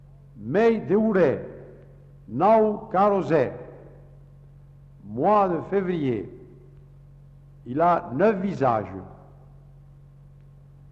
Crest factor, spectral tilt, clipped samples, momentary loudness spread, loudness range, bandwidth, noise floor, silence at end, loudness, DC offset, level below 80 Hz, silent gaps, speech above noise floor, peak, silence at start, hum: 16 dB; -9 dB/octave; under 0.1%; 21 LU; 5 LU; 7.6 kHz; -49 dBFS; 1.75 s; -23 LUFS; under 0.1%; -54 dBFS; none; 27 dB; -8 dBFS; 0.35 s; none